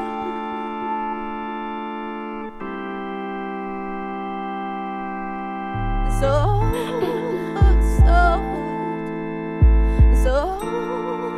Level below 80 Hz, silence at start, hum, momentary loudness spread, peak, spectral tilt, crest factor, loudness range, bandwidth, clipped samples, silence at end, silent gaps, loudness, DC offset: -22 dBFS; 0 s; none; 12 LU; -4 dBFS; -7.5 dB/octave; 16 dB; 10 LU; 11 kHz; under 0.1%; 0 s; none; -23 LUFS; under 0.1%